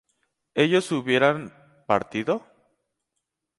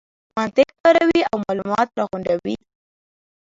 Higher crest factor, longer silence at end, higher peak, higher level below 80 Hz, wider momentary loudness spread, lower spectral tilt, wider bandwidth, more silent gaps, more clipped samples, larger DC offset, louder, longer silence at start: about the same, 20 dB vs 18 dB; first, 1.2 s vs 0.85 s; second, -6 dBFS vs -2 dBFS; second, -66 dBFS vs -56 dBFS; about the same, 11 LU vs 12 LU; about the same, -5.5 dB/octave vs -5.5 dB/octave; first, 11.5 kHz vs 7.8 kHz; second, none vs 0.80-0.84 s; neither; neither; second, -24 LUFS vs -19 LUFS; first, 0.55 s vs 0.35 s